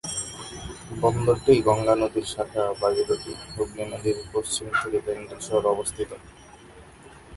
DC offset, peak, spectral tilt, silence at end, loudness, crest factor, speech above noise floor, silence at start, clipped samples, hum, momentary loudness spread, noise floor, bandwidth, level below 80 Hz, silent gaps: under 0.1%; -4 dBFS; -4.5 dB/octave; 0 s; -25 LUFS; 20 dB; 23 dB; 0.05 s; under 0.1%; none; 15 LU; -48 dBFS; 11.5 kHz; -50 dBFS; none